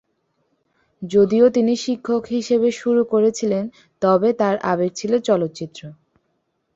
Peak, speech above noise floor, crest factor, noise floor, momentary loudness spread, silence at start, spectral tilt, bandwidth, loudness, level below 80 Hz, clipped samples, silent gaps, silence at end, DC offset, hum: -4 dBFS; 52 dB; 16 dB; -70 dBFS; 12 LU; 1 s; -6 dB/octave; 8 kHz; -19 LUFS; -62 dBFS; under 0.1%; none; 0.8 s; under 0.1%; none